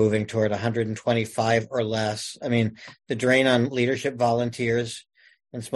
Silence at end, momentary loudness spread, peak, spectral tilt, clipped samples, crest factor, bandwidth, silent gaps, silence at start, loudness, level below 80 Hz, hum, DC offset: 0 s; 12 LU; -6 dBFS; -5.5 dB/octave; under 0.1%; 18 dB; 12 kHz; none; 0 s; -24 LUFS; -60 dBFS; none; under 0.1%